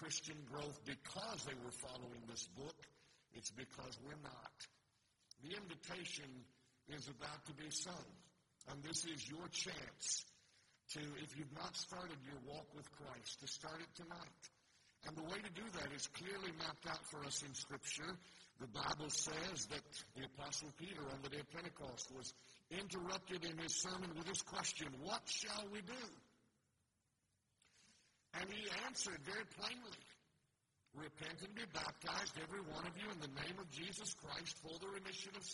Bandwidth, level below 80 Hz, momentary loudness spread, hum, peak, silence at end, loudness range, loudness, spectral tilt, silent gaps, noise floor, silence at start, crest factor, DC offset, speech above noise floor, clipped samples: 11.5 kHz; -76 dBFS; 13 LU; none; -28 dBFS; 0 s; 8 LU; -48 LUFS; -2 dB/octave; none; -86 dBFS; 0 s; 24 dB; under 0.1%; 36 dB; under 0.1%